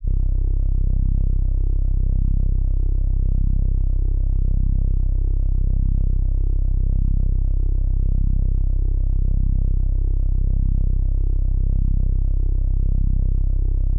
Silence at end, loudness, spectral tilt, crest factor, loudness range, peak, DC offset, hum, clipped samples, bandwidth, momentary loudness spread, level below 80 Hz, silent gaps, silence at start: 0 s; -23 LUFS; -16 dB/octave; 6 dB; 0 LU; -10 dBFS; under 0.1%; none; under 0.1%; 0.8 kHz; 1 LU; -18 dBFS; none; 0 s